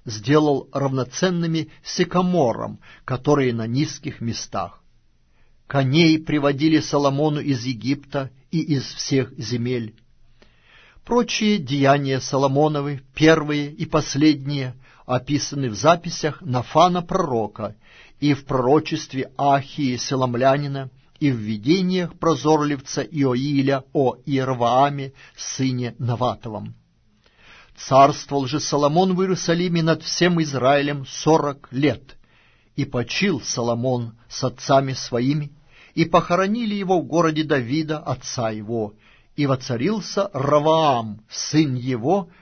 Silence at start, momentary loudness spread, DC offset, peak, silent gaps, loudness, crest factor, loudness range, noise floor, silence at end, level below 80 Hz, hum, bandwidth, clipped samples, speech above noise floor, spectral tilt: 0.05 s; 11 LU; under 0.1%; -2 dBFS; none; -21 LUFS; 18 dB; 4 LU; -59 dBFS; 0.15 s; -50 dBFS; none; 6.6 kHz; under 0.1%; 38 dB; -5.5 dB/octave